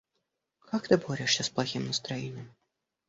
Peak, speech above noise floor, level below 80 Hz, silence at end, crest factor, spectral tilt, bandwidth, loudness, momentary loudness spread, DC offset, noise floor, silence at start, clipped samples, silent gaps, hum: -8 dBFS; 51 dB; -66 dBFS; 0.6 s; 24 dB; -4 dB/octave; 8.2 kHz; -30 LUFS; 10 LU; under 0.1%; -82 dBFS; 0.7 s; under 0.1%; none; none